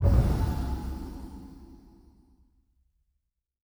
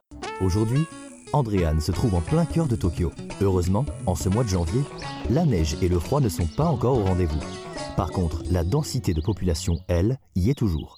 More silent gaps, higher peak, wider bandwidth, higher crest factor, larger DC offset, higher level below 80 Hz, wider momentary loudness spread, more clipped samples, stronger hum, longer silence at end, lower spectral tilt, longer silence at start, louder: neither; about the same, -10 dBFS vs -10 dBFS; first, over 20 kHz vs 15.5 kHz; first, 20 dB vs 14 dB; neither; about the same, -34 dBFS vs -34 dBFS; first, 25 LU vs 6 LU; neither; neither; first, 2 s vs 0.1 s; about the same, -8 dB/octave vs -7 dB/octave; about the same, 0 s vs 0.1 s; second, -30 LUFS vs -25 LUFS